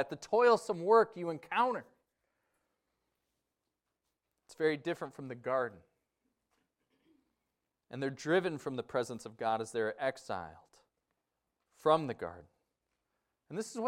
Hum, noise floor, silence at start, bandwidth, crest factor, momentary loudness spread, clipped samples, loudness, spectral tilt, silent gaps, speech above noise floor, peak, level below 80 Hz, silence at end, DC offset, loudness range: none; -87 dBFS; 0 s; 12.5 kHz; 22 dB; 15 LU; under 0.1%; -34 LUFS; -5 dB/octave; none; 54 dB; -14 dBFS; -80 dBFS; 0 s; under 0.1%; 8 LU